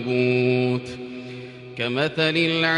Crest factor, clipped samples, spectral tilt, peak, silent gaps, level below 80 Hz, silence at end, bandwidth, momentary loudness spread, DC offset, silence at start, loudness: 16 dB; under 0.1%; -6.5 dB/octave; -8 dBFS; none; -62 dBFS; 0 s; 10.5 kHz; 17 LU; under 0.1%; 0 s; -22 LUFS